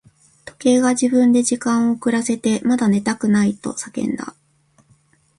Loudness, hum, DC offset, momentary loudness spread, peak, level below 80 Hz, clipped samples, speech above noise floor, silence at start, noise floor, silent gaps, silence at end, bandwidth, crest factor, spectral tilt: -18 LUFS; none; under 0.1%; 10 LU; -4 dBFS; -58 dBFS; under 0.1%; 41 dB; 0.45 s; -58 dBFS; none; 1.1 s; 11.5 kHz; 16 dB; -5 dB/octave